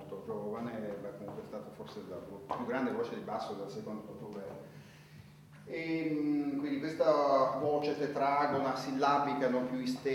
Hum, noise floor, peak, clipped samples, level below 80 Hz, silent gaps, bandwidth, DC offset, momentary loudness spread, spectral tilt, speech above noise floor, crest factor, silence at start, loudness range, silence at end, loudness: none; -55 dBFS; -16 dBFS; under 0.1%; -72 dBFS; none; 17 kHz; under 0.1%; 16 LU; -6.5 dB/octave; 21 dB; 18 dB; 0 s; 9 LU; 0 s; -34 LUFS